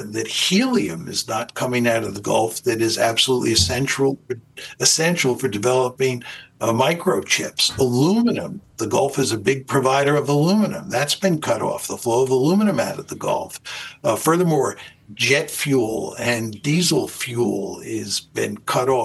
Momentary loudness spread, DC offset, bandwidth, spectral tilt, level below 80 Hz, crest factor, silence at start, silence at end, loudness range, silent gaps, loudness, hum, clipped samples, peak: 9 LU; under 0.1%; 13 kHz; -4 dB/octave; -56 dBFS; 18 dB; 0 s; 0 s; 2 LU; none; -20 LUFS; none; under 0.1%; -2 dBFS